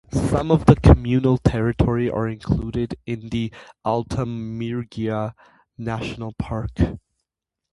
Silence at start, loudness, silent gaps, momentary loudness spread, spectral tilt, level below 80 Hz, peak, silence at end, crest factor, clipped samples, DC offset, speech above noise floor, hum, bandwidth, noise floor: 0.1 s; -22 LUFS; none; 15 LU; -8 dB/octave; -30 dBFS; 0 dBFS; 0.75 s; 20 dB; under 0.1%; under 0.1%; 64 dB; none; 11.5 kHz; -84 dBFS